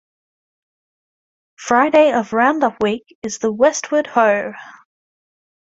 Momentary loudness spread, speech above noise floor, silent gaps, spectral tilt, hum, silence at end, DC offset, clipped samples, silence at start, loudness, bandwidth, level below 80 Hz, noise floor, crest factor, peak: 14 LU; over 74 dB; 3.15-3.22 s; -4 dB/octave; none; 0.95 s; under 0.1%; under 0.1%; 1.6 s; -16 LUFS; 7.8 kHz; -62 dBFS; under -90 dBFS; 18 dB; -2 dBFS